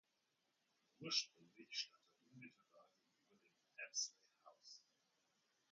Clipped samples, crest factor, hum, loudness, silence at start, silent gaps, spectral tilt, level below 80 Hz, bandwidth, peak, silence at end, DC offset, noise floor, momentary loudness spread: under 0.1%; 28 dB; none; -46 LUFS; 1 s; none; 0 dB/octave; under -90 dBFS; 7.2 kHz; -28 dBFS; 0.9 s; under 0.1%; -86 dBFS; 21 LU